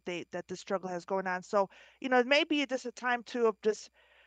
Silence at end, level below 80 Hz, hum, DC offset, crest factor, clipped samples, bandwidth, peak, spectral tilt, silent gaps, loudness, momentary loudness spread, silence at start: 0.4 s; -78 dBFS; none; under 0.1%; 20 dB; under 0.1%; 9.2 kHz; -12 dBFS; -4 dB/octave; none; -32 LUFS; 13 LU; 0.05 s